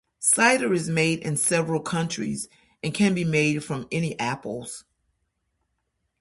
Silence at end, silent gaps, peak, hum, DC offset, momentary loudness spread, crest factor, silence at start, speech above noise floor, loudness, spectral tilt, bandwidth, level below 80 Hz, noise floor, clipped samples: 1.4 s; none; -6 dBFS; none; under 0.1%; 15 LU; 20 dB; 0.2 s; 52 dB; -24 LUFS; -4 dB/octave; 12 kHz; -60 dBFS; -76 dBFS; under 0.1%